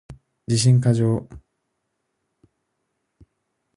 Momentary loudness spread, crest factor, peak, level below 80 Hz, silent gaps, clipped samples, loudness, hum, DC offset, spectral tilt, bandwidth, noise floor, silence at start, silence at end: 11 LU; 18 dB; -6 dBFS; -54 dBFS; none; under 0.1%; -20 LUFS; none; under 0.1%; -6 dB/octave; 11.5 kHz; -76 dBFS; 0.1 s; 2.4 s